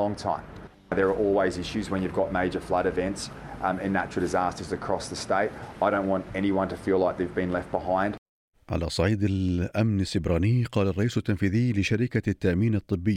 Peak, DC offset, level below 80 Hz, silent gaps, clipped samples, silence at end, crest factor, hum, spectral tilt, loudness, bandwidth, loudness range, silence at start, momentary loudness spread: -10 dBFS; under 0.1%; -50 dBFS; 8.18-8.52 s; under 0.1%; 0 s; 16 dB; none; -6.5 dB/octave; -27 LUFS; 12.5 kHz; 3 LU; 0 s; 7 LU